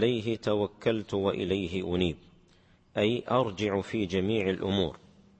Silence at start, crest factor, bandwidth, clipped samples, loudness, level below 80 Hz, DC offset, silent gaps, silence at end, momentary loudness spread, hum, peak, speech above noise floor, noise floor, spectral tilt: 0 s; 18 dB; 8.6 kHz; under 0.1%; -30 LUFS; -56 dBFS; under 0.1%; none; 0.45 s; 3 LU; none; -12 dBFS; 33 dB; -61 dBFS; -6.5 dB/octave